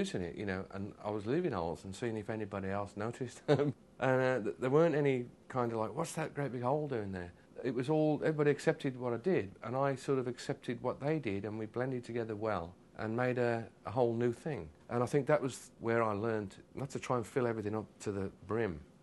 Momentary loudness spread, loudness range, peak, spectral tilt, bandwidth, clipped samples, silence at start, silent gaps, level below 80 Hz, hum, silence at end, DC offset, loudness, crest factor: 10 LU; 4 LU; -14 dBFS; -7 dB/octave; 12 kHz; under 0.1%; 0 s; none; -66 dBFS; none; 0.15 s; under 0.1%; -36 LUFS; 22 dB